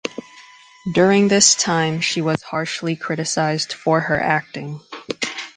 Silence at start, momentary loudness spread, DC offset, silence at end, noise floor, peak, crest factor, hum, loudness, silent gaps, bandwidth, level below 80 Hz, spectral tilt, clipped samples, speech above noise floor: 0.05 s; 18 LU; under 0.1%; 0.05 s; -45 dBFS; 0 dBFS; 20 dB; none; -18 LUFS; none; 10 kHz; -56 dBFS; -3.5 dB/octave; under 0.1%; 27 dB